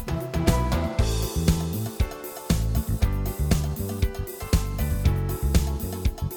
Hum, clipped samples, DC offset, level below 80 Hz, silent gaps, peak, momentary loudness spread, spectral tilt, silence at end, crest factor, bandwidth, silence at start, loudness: none; under 0.1%; under 0.1%; -28 dBFS; none; -6 dBFS; 5 LU; -6 dB/octave; 0 s; 18 dB; 20 kHz; 0 s; -26 LUFS